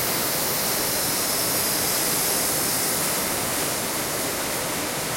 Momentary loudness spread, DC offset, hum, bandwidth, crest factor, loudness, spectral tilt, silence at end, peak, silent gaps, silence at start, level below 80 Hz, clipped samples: 4 LU; under 0.1%; none; 16.5 kHz; 14 dB; -22 LUFS; -1.5 dB/octave; 0 s; -10 dBFS; none; 0 s; -52 dBFS; under 0.1%